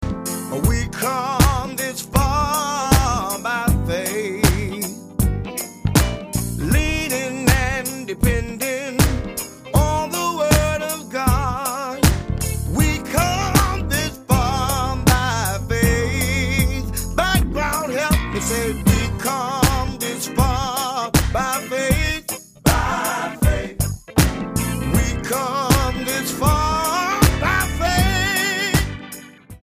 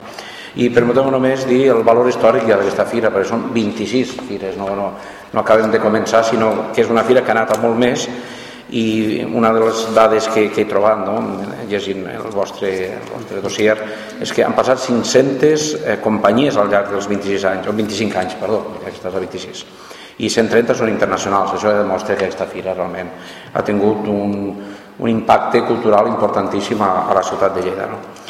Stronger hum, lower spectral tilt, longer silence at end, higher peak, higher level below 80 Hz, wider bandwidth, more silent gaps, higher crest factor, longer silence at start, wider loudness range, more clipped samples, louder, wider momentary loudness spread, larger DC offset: neither; about the same, -4.5 dB/octave vs -5 dB/octave; about the same, 0.05 s vs 0 s; about the same, 0 dBFS vs 0 dBFS; first, -26 dBFS vs -52 dBFS; about the same, 15.5 kHz vs 15 kHz; neither; about the same, 20 dB vs 16 dB; about the same, 0 s vs 0 s; second, 2 LU vs 5 LU; neither; second, -20 LUFS vs -16 LUFS; second, 7 LU vs 12 LU; neither